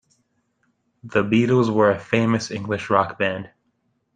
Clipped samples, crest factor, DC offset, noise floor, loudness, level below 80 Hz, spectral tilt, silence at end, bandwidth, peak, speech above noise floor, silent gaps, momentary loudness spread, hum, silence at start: under 0.1%; 20 dB; under 0.1%; -70 dBFS; -20 LUFS; -60 dBFS; -6.5 dB/octave; 0.7 s; 9.2 kHz; -2 dBFS; 50 dB; none; 9 LU; none; 1.05 s